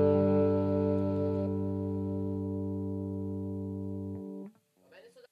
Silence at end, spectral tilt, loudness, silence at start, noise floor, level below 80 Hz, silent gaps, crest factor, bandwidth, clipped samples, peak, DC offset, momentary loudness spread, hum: 0.1 s; -11 dB/octave; -32 LUFS; 0 s; -60 dBFS; -74 dBFS; none; 16 dB; 4.9 kHz; under 0.1%; -16 dBFS; under 0.1%; 13 LU; none